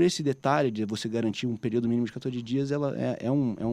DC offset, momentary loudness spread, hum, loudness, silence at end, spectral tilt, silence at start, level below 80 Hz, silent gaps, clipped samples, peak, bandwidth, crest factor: under 0.1%; 5 LU; none; -28 LUFS; 0 s; -6 dB/octave; 0 s; -64 dBFS; none; under 0.1%; -10 dBFS; 13 kHz; 18 dB